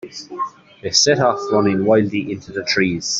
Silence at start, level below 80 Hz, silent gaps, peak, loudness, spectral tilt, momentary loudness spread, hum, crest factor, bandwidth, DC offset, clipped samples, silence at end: 0.05 s; -56 dBFS; none; -2 dBFS; -17 LUFS; -3.5 dB/octave; 14 LU; none; 18 dB; 8 kHz; under 0.1%; under 0.1%; 0 s